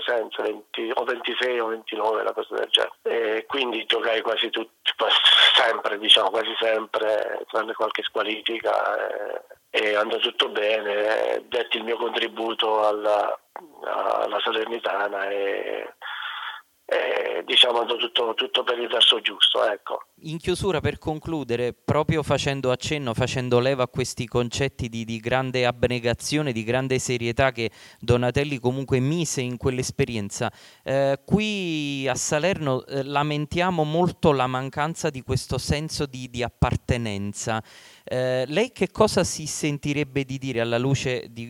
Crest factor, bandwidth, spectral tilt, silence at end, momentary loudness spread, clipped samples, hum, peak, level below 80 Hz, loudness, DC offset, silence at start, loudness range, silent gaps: 24 dB; 17.5 kHz; -4 dB/octave; 0 s; 11 LU; under 0.1%; none; 0 dBFS; -48 dBFS; -23 LUFS; under 0.1%; 0 s; 7 LU; none